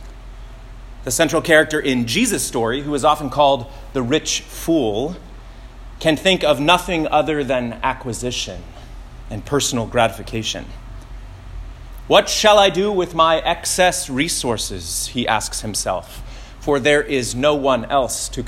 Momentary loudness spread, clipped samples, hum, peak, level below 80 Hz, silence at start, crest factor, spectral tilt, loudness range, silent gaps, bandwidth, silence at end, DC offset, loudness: 22 LU; under 0.1%; none; 0 dBFS; -36 dBFS; 0 s; 20 dB; -3.5 dB/octave; 6 LU; none; 16.5 kHz; 0 s; under 0.1%; -18 LUFS